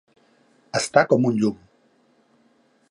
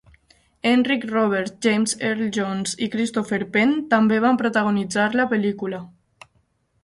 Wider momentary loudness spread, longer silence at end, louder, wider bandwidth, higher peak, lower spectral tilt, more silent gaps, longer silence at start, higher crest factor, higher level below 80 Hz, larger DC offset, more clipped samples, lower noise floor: first, 10 LU vs 7 LU; first, 1.35 s vs 0.95 s; about the same, -21 LUFS vs -21 LUFS; about the same, 11.5 kHz vs 11.5 kHz; about the same, -2 dBFS vs -4 dBFS; about the same, -5 dB/octave vs -4.5 dB/octave; neither; about the same, 0.75 s vs 0.65 s; about the same, 22 dB vs 18 dB; about the same, -64 dBFS vs -62 dBFS; neither; neither; second, -61 dBFS vs -65 dBFS